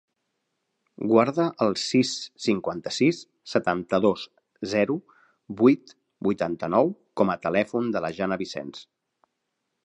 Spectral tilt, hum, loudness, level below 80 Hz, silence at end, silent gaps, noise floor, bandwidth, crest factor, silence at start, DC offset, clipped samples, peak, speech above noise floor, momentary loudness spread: -5.5 dB/octave; none; -25 LUFS; -64 dBFS; 1.05 s; none; -79 dBFS; 9.8 kHz; 20 dB; 1 s; under 0.1%; under 0.1%; -6 dBFS; 55 dB; 13 LU